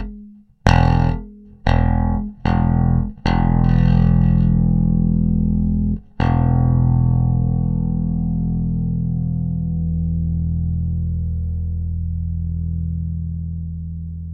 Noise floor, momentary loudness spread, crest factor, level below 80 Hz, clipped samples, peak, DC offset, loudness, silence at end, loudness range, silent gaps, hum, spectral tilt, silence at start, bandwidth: -41 dBFS; 9 LU; 18 dB; -24 dBFS; under 0.1%; 0 dBFS; under 0.1%; -19 LUFS; 0 s; 6 LU; none; none; -9 dB/octave; 0 s; 6.4 kHz